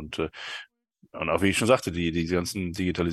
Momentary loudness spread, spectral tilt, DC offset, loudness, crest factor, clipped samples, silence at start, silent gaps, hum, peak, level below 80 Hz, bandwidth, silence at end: 14 LU; -5 dB/octave; under 0.1%; -26 LUFS; 22 dB; under 0.1%; 0 s; none; none; -6 dBFS; -48 dBFS; 12.5 kHz; 0 s